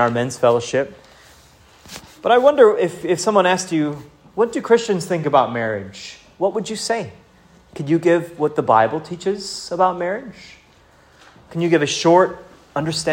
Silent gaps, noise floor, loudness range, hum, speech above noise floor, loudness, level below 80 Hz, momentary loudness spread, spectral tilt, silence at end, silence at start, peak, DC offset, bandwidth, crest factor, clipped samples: none; -51 dBFS; 5 LU; none; 33 dB; -18 LUFS; -58 dBFS; 18 LU; -5 dB/octave; 0 s; 0 s; 0 dBFS; under 0.1%; 16.5 kHz; 18 dB; under 0.1%